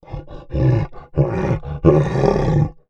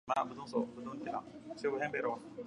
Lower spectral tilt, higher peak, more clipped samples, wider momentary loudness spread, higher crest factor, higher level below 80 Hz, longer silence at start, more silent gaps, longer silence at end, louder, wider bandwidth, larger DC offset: first, -9.5 dB/octave vs -5.5 dB/octave; first, 0 dBFS vs -20 dBFS; neither; first, 12 LU vs 8 LU; about the same, 18 dB vs 20 dB; first, -30 dBFS vs -74 dBFS; about the same, 0.1 s vs 0.05 s; neither; first, 0.2 s vs 0 s; first, -18 LUFS vs -39 LUFS; second, 7.4 kHz vs 10.5 kHz; neither